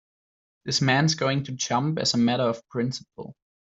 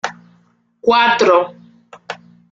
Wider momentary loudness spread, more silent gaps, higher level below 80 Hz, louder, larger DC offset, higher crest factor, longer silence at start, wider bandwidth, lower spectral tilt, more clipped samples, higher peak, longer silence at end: about the same, 19 LU vs 21 LU; neither; about the same, -62 dBFS vs -60 dBFS; second, -24 LUFS vs -14 LUFS; neither; about the same, 18 dB vs 16 dB; first, 0.65 s vs 0.05 s; about the same, 8.2 kHz vs 7.6 kHz; about the same, -4.5 dB/octave vs -3.5 dB/octave; neither; second, -8 dBFS vs -2 dBFS; about the same, 0.35 s vs 0.4 s